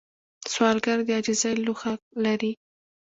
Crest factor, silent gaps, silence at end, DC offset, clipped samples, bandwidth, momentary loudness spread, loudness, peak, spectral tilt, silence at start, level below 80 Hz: 20 dB; 2.02-2.11 s; 0.6 s; under 0.1%; under 0.1%; 8 kHz; 9 LU; -25 LUFS; -8 dBFS; -3.5 dB/octave; 0.4 s; -68 dBFS